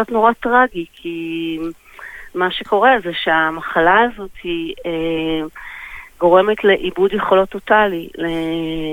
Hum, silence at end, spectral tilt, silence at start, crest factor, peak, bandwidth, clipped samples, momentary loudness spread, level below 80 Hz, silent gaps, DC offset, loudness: none; 0 s; -6 dB/octave; 0 s; 16 dB; -2 dBFS; 16.5 kHz; under 0.1%; 16 LU; -44 dBFS; none; under 0.1%; -17 LUFS